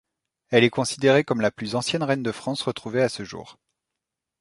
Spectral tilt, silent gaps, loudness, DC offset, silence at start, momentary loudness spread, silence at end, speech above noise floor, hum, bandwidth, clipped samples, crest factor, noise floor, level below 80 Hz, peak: -5 dB/octave; none; -23 LUFS; under 0.1%; 0.5 s; 9 LU; 0.9 s; 62 dB; none; 11.5 kHz; under 0.1%; 22 dB; -85 dBFS; -62 dBFS; -4 dBFS